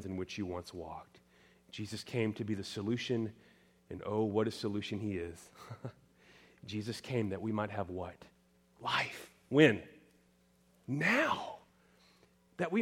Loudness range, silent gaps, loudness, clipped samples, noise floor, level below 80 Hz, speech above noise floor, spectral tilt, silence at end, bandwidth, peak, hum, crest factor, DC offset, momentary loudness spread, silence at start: 7 LU; none; -35 LUFS; under 0.1%; -69 dBFS; -70 dBFS; 34 dB; -5.5 dB/octave; 0 s; 16.5 kHz; -10 dBFS; none; 28 dB; under 0.1%; 20 LU; 0 s